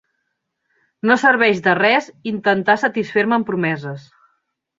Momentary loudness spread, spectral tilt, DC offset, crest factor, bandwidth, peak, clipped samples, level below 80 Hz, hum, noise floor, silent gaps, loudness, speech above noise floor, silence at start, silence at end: 12 LU; -5.5 dB/octave; under 0.1%; 18 dB; 7.8 kHz; -2 dBFS; under 0.1%; -64 dBFS; none; -74 dBFS; none; -17 LUFS; 57 dB; 1.05 s; 0.8 s